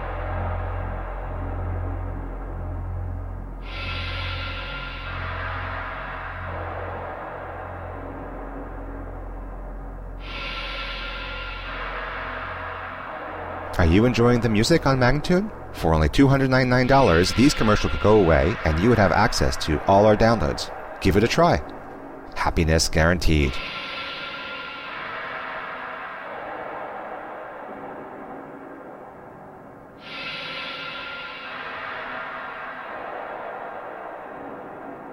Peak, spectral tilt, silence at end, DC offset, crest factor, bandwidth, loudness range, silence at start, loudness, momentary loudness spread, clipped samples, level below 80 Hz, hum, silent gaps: -6 dBFS; -5.5 dB/octave; 0 s; under 0.1%; 18 dB; 16 kHz; 16 LU; 0 s; -24 LUFS; 19 LU; under 0.1%; -34 dBFS; none; none